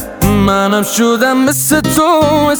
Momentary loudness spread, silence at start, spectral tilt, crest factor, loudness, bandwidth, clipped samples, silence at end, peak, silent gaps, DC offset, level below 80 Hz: 2 LU; 0 s; -4.5 dB/octave; 10 dB; -11 LUFS; over 20 kHz; under 0.1%; 0 s; 0 dBFS; none; under 0.1%; -30 dBFS